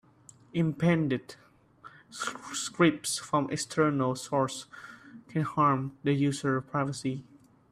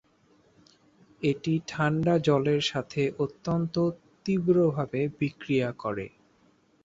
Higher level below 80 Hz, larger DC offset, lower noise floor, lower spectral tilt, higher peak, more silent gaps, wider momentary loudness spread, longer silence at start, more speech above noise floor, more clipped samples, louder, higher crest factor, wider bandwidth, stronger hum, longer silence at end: about the same, -66 dBFS vs -62 dBFS; neither; second, -57 dBFS vs -64 dBFS; about the same, -5.5 dB/octave vs -6.5 dB/octave; about the same, -12 dBFS vs -10 dBFS; neither; first, 15 LU vs 9 LU; second, 0.55 s vs 1.2 s; second, 28 dB vs 37 dB; neither; about the same, -29 LUFS vs -28 LUFS; about the same, 20 dB vs 18 dB; first, 14.5 kHz vs 7.8 kHz; neither; second, 0.5 s vs 0.75 s